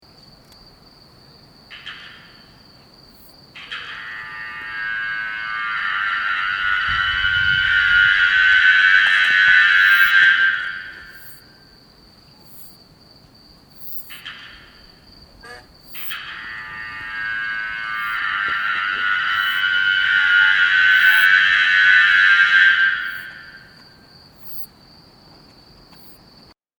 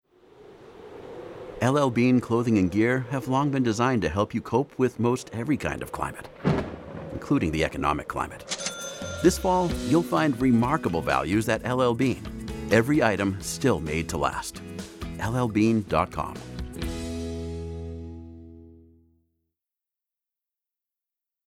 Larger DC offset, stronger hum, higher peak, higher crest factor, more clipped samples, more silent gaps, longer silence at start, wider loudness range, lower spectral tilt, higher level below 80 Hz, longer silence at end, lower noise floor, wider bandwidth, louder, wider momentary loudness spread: neither; neither; first, -2 dBFS vs -6 dBFS; about the same, 18 dB vs 20 dB; neither; neither; first, 1.7 s vs 0.4 s; first, 24 LU vs 11 LU; second, -0.5 dB/octave vs -6 dB/octave; about the same, -50 dBFS vs -46 dBFS; second, 2.15 s vs 2.75 s; second, -50 dBFS vs -87 dBFS; first, over 20 kHz vs 16.5 kHz; first, -15 LUFS vs -25 LUFS; first, 21 LU vs 15 LU